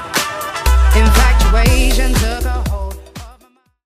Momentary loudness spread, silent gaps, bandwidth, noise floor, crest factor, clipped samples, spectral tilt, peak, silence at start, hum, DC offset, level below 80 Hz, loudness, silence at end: 16 LU; none; 15.5 kHz; -52 dBFS; 12 dB; under 0.1%; -4.5 dB/octave; 0 dBFS; 0 s; none; under 0.1%; -14 dBFS; -14 LUFS; 0.55 s